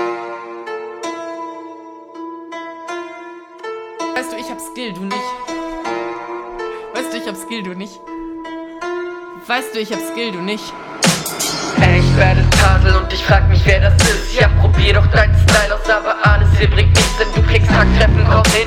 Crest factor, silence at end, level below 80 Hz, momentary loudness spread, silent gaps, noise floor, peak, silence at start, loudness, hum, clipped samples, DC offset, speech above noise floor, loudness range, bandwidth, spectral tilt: 14 dB; 0 s; -20 dBFS; 18 LU; none; -35 dBFS; 0 dBFS; 0 s; -15 LUFS; none; under 0.1%; under 0.1%; 22 dB; 15 LU; 15.5 kHz; -5 dB/octave